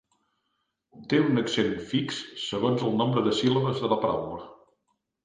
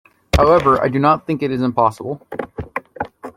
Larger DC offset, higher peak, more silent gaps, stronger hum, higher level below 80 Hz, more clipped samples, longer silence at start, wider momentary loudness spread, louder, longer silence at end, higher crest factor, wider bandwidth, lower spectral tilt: neither; second, -8 dBFS vs -2 dBFS; neither; neither; second, -62 dBFS vs -34 dBFS; neither; first, 0.95 s vs 0.35 s; second, 9 LU vs 16 LU; second, -26 LUFS vs -16 LUFS; first, 0.7 s vs 0.05 s; about the same, 18 dB vs 16 dB; second, 9.6 kHz vs 16.5 kHz; about the same, -6 dB/octave vs -7 dB/octave